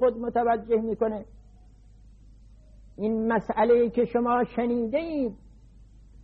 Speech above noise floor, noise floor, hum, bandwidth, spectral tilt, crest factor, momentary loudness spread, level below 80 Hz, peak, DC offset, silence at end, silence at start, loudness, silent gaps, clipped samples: 27 dB; -52 dBFS; none; 4.7 kHz; -9 dB/octave; 16 dB; 8 LU; -52 dBFS; -10 dBFS; under 0.1%; 0 s; 0 s; -26 LUFS; none; under 0.1%